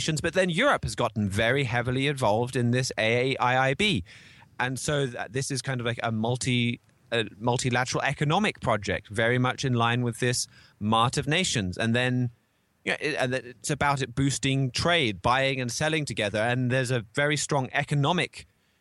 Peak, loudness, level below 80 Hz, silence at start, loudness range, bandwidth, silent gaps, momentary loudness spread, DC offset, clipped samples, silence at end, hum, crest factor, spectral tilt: -10 dBFS; -26 LUFS; -54 dBFS; 0 s; 3 LU; 12.5 kHz; none; 6 LU; under 0.1%; under 0.1%; 0.4 s; none; 16 dB; -4.5 dB/octave